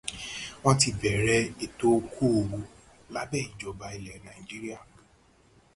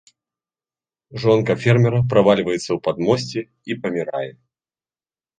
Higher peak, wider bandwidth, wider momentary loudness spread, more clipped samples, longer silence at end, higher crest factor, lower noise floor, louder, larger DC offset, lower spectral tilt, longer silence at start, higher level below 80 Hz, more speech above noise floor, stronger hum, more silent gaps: second, -6 dBFS vs -2 dBFS; first, 11.5 kHz vs 9.4 kHz; first, 18 LU vs 13 LU; neither; second, 0.95 s vs 1.1 s; about the same, 22 dB vs 18 dB; second, -61 dBFS vs under -90 dBFS; second, -28 LUFS vs -19 LUFS; neither; second, -4.5 dB/octave vs -7 dB/octave; second, 0.05 s vs 1.1 s; about the same, -52 dBFS vs -54 dBFS; second, 33 dB vs over 72 dB; neither; neither